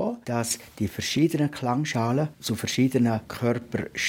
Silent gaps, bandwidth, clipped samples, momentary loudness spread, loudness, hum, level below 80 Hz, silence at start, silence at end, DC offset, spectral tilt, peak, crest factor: none; 18 kHz; under 0.1%; 7 LU; -26 LUFS; none; -60 dBFS; 0 s; 0 s; under 0.1%; -5 dB/octave; -10 dBFS; 16 dB